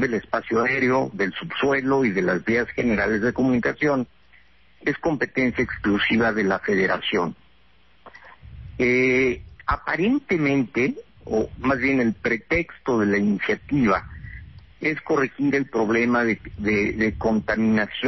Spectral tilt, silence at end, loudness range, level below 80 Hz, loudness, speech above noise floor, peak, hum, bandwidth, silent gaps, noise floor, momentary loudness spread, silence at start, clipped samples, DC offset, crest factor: -6.5 dB/octave; 0 s; 2 LU; -46 dBFS; -22 LUFS; 37 dB; -8 dBFS; none; 6.2 kHz; none; -59 dBFS; 7 LU; 0 s; under 0.1%; 0.2%; 14 dB